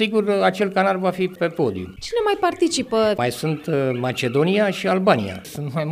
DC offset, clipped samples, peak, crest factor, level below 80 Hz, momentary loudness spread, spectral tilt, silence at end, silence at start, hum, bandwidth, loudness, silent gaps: under 0.1%; under 0.1%; -4 dBFS; 18 dB; -54 dBFS; 7 LU; -5.5 dB/octave; 0 s; 0 s; none; 15.5 kHz; -21 LUFS; none